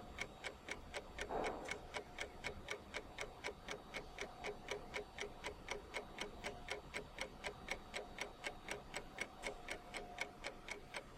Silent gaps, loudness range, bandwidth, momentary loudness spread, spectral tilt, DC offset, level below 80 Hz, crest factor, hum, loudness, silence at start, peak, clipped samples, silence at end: none; 1 LU; 16 kHz; 4 LU; -2.5 dB/octave; under 0.1%; -60 dBFS; 22 dB; none; -48 LUFS; 0 s; -26 dBFS; under 0.1%; 0 s